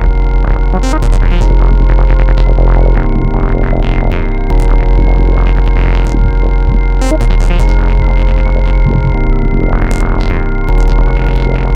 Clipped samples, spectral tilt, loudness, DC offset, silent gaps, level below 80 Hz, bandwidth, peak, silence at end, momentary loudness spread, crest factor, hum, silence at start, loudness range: under 0.1%; -7.5 dB/octave; -12 LUFS; under 0.1%; none; -8 dBFS; 7.8 kHz; 0 dBFS; 0 s; 3 LU; 8 dB; none; 0 s; 1 LU